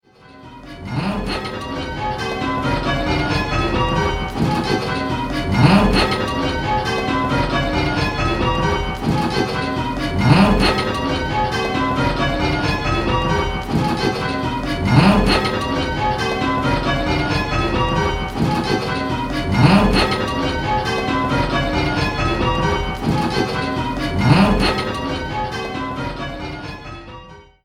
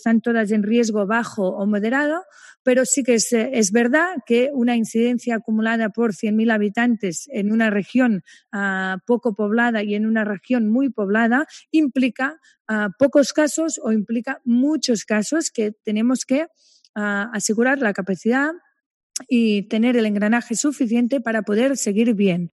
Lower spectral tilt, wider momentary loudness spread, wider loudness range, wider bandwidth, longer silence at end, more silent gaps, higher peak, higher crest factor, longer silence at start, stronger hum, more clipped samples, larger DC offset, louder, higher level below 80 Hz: first, -6 dB/octave vs -4.5 dB/octave; first, 10 LU vs 6 LU; about the same, 2 LU vs 3 LU; first, 15 kHz vs 12.5 kHz; first, 0.25 s vs 0.05 s; second, none vs 2.59-2.65 s, 12.60-12.65 s, 16.89-16.94 s, 18.86-19.10 s; first, 0 dBFS vs -4 dBFS; about the same, 18 dB vs 16 dB; first, 0.3 s vs 0.05 s; neither; neither; neither; about the same, -19 LUFS vs -20 LUFS; first, -30 dBFS vs -76 dBFS